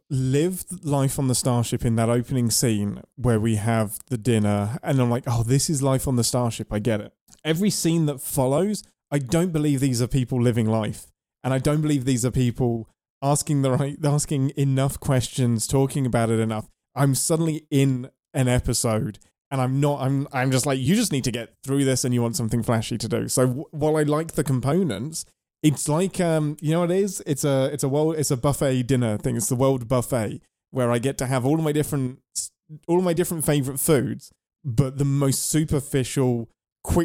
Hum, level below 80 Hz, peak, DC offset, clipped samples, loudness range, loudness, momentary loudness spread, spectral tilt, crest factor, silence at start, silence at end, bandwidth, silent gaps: none; -44 dBFS; -6 dBFS; under 0.1%; under 0.1%; 1 LU; -23 LUFS; 7 LU; -5.5 dB/octave; 18 dB; 0.1 s; 0 s; 16.5 kHz; 7.21-7.27 s, 13.10-13.21 s, 19.41-19.51 s, 36.72-36.76 s